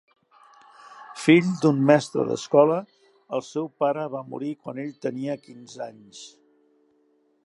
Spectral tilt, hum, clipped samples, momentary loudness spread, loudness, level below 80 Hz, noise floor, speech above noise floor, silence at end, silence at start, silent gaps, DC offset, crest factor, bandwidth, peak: -6.5 dB/octave; none; under 0.1%; 24 LU; -23 LUFS; -76 dBFS; -65 dBFS; 42 dB; 1.15 s; 0.9 s; none; under 0.1%; 22 dB; 11.5 kHz; -4 dBFS